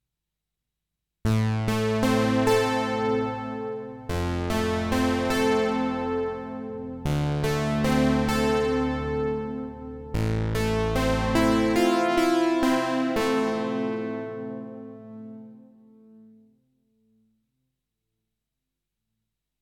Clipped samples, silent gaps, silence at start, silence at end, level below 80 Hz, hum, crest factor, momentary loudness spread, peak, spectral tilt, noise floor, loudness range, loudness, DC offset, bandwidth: under 0.1%; none; 1.25 s; 4.05 s; -42 dBFS; 50 Hz at -65 dBFS; 16 dB; 13 LU; -10 dBFS; -6 dB/octave; -85 dBFS; 7 LU; -25 LUFS; under 0.1%; 19 kHz